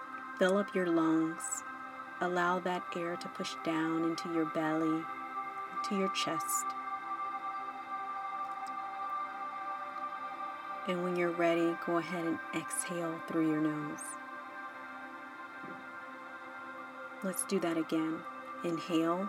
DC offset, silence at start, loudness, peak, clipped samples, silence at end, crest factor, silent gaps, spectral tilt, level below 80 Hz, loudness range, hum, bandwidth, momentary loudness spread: under 0.1%; 0 s; -35 LUFS; -16 dBFS; under 0.1%; 0 s; 20 dB; none; -4.5 dB/octave; under -90 dBFS; 6 LU; none; 16.5 kHz; 14 LU